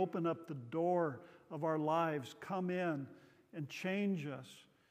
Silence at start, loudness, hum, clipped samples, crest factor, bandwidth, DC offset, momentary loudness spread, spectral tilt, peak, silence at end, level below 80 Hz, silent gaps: 0 s; -39 LUFS; none; under 0.1%; 16 dB; 15.5 kHz; under 0.1%; 15 LU; -7 dB/octave; -22 dBFS; 0.3 s; -88 dBFS; none